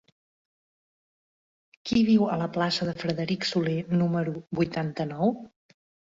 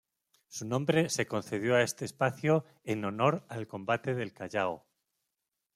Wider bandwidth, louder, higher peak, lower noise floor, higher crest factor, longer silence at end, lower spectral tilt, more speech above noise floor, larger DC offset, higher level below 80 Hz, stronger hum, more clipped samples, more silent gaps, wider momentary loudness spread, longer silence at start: second, 7.8 kHz vs 15.5 kHz; first, -27 LUFS vs -31 LUFS; about the same, -10 dBFS vs -12 dBFS; first, under -90 dBFS vs -86 dBFS; about the same, 18 dB vs 20 dB; second, 0.65 s vs 0.95 s; first, -6.5 dB/octave vs -5 dB/octave; first, over 64 dB vs 55 dB; neither; first, -60 dBFS vs -72 dBFS; neither; neither; neither; about the same, 8 LU vs 10 LU; first, 1.85 s vs 0.5 s